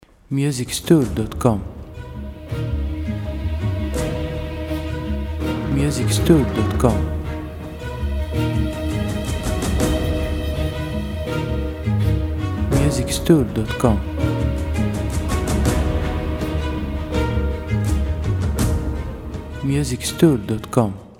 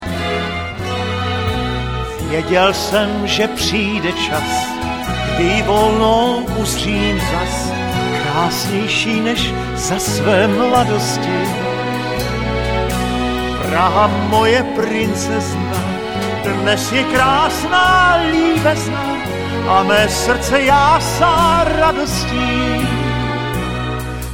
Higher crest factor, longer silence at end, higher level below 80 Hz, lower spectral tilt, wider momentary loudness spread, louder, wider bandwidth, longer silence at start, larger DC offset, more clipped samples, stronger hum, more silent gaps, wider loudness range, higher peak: about the same, 20 dB vs 16 dB; about the same, 0.05 s vs 0 s; about the same, -26 dBFS vs -30 dBFS; first, -6.5 dB/octave vs -4.5 dB/octave; about the same, 10 LU vs 8 LU; second, -21 LUFS vs -16 LUFS; about the same, 16.5 kHz vs 16.5 kHz; first, 0.3 s vs 0 s; second, under 0.1% vs 0.5%; neither; neither; neither; about the same, 4 LU vs 3 LU; about the same, 0 dBFS vs 0 dBFS